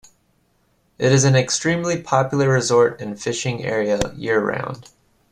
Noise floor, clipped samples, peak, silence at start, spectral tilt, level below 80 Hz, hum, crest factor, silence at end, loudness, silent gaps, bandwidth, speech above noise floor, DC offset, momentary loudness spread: -63 dBFS; under 0.1%; -2 dBFS; 1 s; -4.5 dB/octave; -48 dBFS; none; 18 dB; 0.5 s; -19 LUFS; none; 11 kHz; 44 dB; under 0.1%; 10 LU